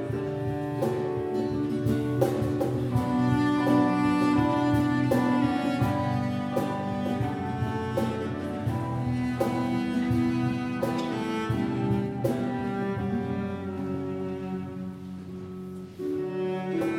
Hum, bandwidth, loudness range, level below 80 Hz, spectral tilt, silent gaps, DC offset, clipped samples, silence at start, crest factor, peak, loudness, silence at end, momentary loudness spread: none; 17 kHz; 8 LU; -50 dBFS; -7.5 dB/octave; none; under 0.1%; under 0.1%; 0 s; 18 dB; -8 dBFS; -28 LUFS; 0 s; 9 LU